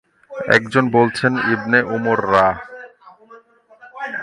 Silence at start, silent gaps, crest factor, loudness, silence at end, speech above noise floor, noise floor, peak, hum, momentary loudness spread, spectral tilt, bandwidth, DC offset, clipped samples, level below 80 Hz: 0.3 s; none; 18 dB; -16 LUFS; 0 s; 31 dB; -47 dBFS; 0 dBFS; none; 16 LU; -6 dB/octave; 11.5 kHz; under 0.1%; under 0.1%; -52 dBFS